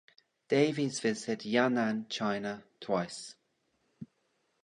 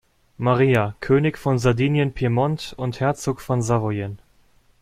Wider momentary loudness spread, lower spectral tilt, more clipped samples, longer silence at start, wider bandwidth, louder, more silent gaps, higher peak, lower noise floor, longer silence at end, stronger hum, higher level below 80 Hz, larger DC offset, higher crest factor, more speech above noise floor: first, 22 LU vs 8 LU; second, -5 dB/octave vs -7 dB/octave; neither; about the same, 0.5 s vs 0.4 s; second, 11 kHz vs 14.5 kHz; second, -32 LUFS vs -21 LUFS; neither; second, -12 dBFS vs -4 dBFS; first, -76 dBFS vs -57 dBFS; about the same, 0.6 s vs 0.65 s; neither; second, -76 dBFS vs -46 dBFS; neither; about the same, 22 dB vs 18 dB; first, 45 dB vs 37 dB